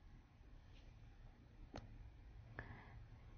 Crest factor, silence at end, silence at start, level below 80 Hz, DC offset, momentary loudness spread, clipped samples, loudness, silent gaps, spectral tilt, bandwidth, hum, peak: 26 dB; 0 s; 0 s; -62 dBFS; under 0.1%; 10 LU; under 0.1%; -61 LUFS; none; -5.5 dB/octave; 6.4 kHz; none; -32 dBFS